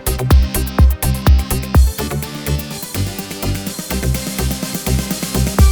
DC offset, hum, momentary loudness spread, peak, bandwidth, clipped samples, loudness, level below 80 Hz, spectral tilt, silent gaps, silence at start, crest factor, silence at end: 0.2%; none; 8 LU; 0 dBFS; over 20 kHz; under 0.1%; -17 LUFS; -18 dBFS; -5 dB/octave; none; 0 s; 14 dB; 0 s